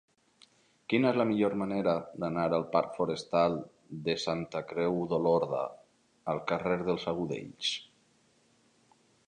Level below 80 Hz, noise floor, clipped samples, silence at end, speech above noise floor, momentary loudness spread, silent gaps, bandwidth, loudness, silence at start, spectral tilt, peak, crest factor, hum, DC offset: -66 dBFS; -68 dBFS; under 0.1%; 1.45 s; 37 dB; 9 LU; none; 10 kHz; -31 LUFS; 0.9 s; -6 dB/octave; -12 dBFS; 20 dB; none; under 0.1%